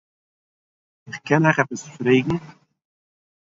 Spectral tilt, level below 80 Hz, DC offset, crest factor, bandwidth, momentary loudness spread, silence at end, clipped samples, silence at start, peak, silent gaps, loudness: -6.5 dB/octave; -58 dBFS; under 0.1%; 20 dB; 8 kHz; 15 LU; 0.9 s; under 0.1%; 1.05 s; -4 dBFS; none; -20 LUFS